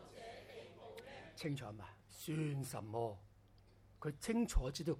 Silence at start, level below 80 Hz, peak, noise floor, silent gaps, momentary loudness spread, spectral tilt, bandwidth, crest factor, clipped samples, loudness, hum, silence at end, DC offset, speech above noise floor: 0 s; -50 dBFS; -22 dBFS; -66 dBFS; none; 16 LU; -5.5 dB/octave; 16.5 kHz; 22 dB; under 0.1%; -44 LUFS; none; 0 s; under 0.1%; 25 dB